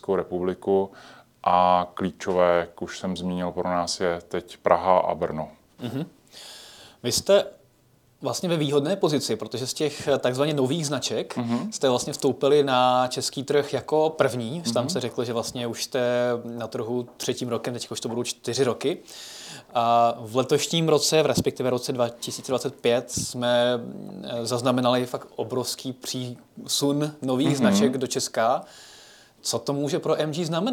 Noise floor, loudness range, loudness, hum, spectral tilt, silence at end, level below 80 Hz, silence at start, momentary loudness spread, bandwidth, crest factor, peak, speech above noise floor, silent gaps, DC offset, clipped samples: -60 dBFS; 4 LU; -25 LUFS; none; -4.5 dB/octave; 0 s; -60 dBFS; 0.1 s; 13 LU; 19 kHz; 22 dB; -2 dBFS; 36 dB; none; under 0.1%; under 0.1%